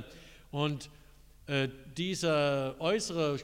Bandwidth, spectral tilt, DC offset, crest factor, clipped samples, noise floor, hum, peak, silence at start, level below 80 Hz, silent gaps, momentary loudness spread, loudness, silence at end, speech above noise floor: 16 kHz; -5 dB/octave; under 0.1%; 16 dB; under 0.1%; -53 dBFS; none; -16 dBFS; 0 s; -58 dBFS; none; 16 LU; -32 LUFS; 0 s; 21 dB